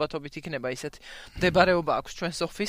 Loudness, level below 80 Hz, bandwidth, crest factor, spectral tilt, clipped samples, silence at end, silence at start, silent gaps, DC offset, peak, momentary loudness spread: -27 LUFS; -48 dBFS; 16 kHz; 22 dB; -5 dB/octave; under 0.1%; 0 s; 0 s; none; under 0.1%; -4 dBFS; 16 LU